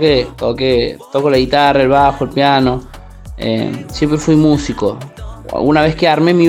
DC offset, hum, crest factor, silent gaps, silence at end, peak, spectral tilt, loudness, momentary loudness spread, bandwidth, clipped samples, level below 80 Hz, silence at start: under 0.1%; none; 14 dB; none; 0 s; 0 dBFS; -6 dB/octave; -13 LUFS; 11 LU; 15 kHz; under 0.1%; -34 dBFS; 0 s